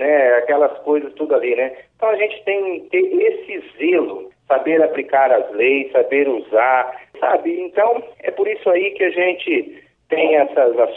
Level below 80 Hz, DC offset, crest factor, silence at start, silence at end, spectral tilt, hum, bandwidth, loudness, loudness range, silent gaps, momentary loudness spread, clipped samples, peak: -70 dBFS; under 0.1%; 16 dB; 0 s; 0 s; -7 dB/octave; none; 4 kHz; -17 LUFS; 2 LU; none; 7 LU; under 0.1%; -2 dBFS